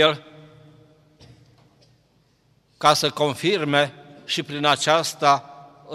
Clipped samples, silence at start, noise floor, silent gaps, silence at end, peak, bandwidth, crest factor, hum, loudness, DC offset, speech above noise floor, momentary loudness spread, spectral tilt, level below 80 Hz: under 0.1%; 0 s; -62 dBFS; none; 0 s; -2 dBFS; 16 kHz; 22 dB; none; -21 LUFS; under 0.1%; 42 dB; 9 LU; -3.5 dB/octave; -68 dBFS